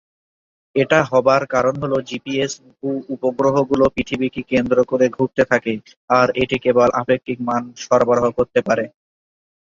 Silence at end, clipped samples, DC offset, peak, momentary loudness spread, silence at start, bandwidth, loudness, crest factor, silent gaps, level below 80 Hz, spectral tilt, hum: 0.85 s; under 0.1%; under 0.1%; -2 dBFS; 9 LU; 0.75 s; 7.4 kHz; -18 LUFS; 18 dB; 5.97-6.08 s; -50 dBFS; -5.5 dB/octave; none